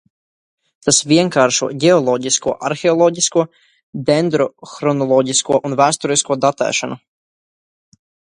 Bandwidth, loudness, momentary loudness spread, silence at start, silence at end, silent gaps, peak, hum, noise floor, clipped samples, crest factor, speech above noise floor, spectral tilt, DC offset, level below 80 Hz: 11.5 kHz; -15 LUFS; 9 LU; 0.85 s; 1.4 s; 3.83-3.93 s; 0 dBFS; none; under -90 dBFS; under 0.1%; 16 dB; over 75 dB; -3.5 dB/octave; under 0.1%; -60 dBFS